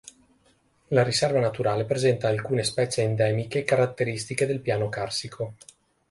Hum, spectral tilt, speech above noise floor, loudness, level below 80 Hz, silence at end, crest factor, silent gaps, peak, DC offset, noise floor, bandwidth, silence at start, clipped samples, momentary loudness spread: none; -5 dB/octave; 39 dB; -25 LUFS; -60 dBFS; 0.55 s; 20 dB; none; -6 dBFS; under 0.1%; -64 dBFS; 11.5 kHz; 0.9 s; under 0.1%; 7 LU